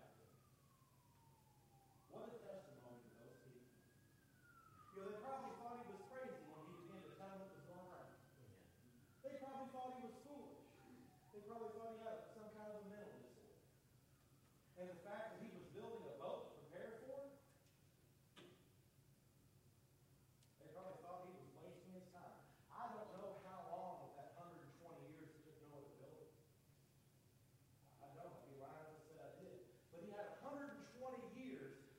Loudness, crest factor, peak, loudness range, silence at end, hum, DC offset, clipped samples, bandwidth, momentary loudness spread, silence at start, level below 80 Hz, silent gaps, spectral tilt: -57 LUFS; 20 dB; -38 dBFS; 8 LU; 0 s; none; under 0.1%; under 0.1%; 16 kHz; 13 LU; 0 s; -86 dBFS; none; -6 dB/octave